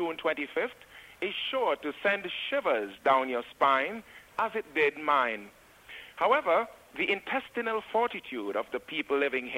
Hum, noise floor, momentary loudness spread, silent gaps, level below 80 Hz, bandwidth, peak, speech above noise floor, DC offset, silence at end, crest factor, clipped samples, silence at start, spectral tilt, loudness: none; -50 dBFS; 11 LU; none; -70 dBFS; 16 kHz; -10 dBFS; 20 dB; under 0.1%; 0 s; 20 dB; under 0.1%; 0 s; -4 dB/octave; -30 LUFS